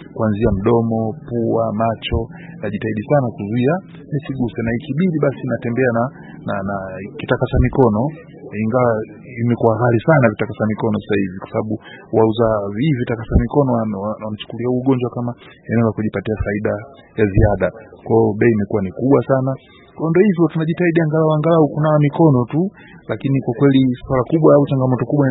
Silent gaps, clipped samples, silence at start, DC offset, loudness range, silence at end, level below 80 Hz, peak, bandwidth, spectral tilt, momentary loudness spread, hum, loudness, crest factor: none; under 0.1%; 0 s; under 0.1%; 5 LU; 0 s; -34 dBFS; 0 dBFS; 4.1 kHz; -12.5 dB/octave; 11 LU; none; -18 LUFS; 16 dB